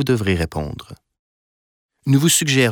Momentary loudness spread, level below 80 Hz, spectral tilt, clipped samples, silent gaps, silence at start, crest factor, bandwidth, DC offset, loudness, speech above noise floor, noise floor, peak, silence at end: 16 LU; -40 dBFS; -4 dB/octave; under 0.1%; 1.19-1.89 s; 0 s; 16 dB; 20 kHz; under 0.1%; -17 LUFS; over 72 dB; under -90 dBFS; -4 dBFS; 0 s